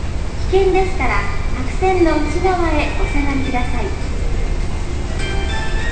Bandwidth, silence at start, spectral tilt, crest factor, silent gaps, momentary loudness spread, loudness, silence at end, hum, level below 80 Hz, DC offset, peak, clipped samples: 9 kHz; 0 s; -6 dB/octave; 14 dB; none; 9 LU; -19 LUFS; 0 s; none; -20 dBFS; 4%; -2 dBFS; under 0.1%